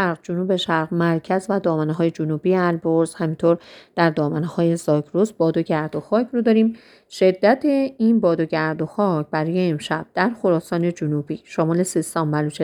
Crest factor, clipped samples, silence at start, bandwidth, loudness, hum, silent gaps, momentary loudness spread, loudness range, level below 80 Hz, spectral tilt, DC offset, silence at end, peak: 18 dB; under 0.1%; 0 s; 19.5 kHz; -21 LUFS; none; none; 6 LU; 2 LU; -64 dBFS; -6.5 dB/octave; under 0.1%; 0 s; -2 dBFS